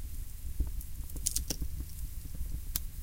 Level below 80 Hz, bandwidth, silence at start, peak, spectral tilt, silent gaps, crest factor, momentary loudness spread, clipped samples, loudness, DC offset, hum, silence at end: -38 dBFS; 17 kHz; 0 s; -8 dBFS; -3 dB/octave; none; 30 dB; 11 LU; under 0.1%; -39 LUFS; under 0.1%; none; 0 s